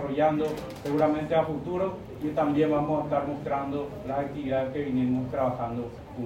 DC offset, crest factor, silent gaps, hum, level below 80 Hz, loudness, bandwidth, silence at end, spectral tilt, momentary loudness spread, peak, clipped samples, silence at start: under 0.1%; 16 dB; none; none; -52 dBFS; -28 LUFS; 16 kHz; 0 s; -8 dB/octave; 8 LU; -12 dBFS; under 0.1%; 0 s